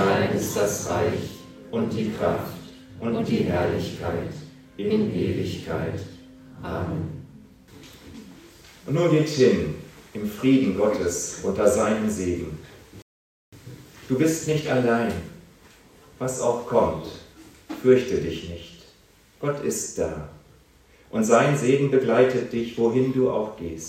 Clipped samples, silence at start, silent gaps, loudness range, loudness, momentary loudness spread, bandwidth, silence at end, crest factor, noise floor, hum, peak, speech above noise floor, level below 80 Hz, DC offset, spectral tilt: under 0.1%; 0 s; 13.02-13.52 s; 7 LU; -24 LUFS; 21 LU; 16 kHz; 0 s; 22 dB; -56 dBFS; none; -4 dBFS; 33 dB; -52 dBFS; under 0.1%; -5.5 dB/octave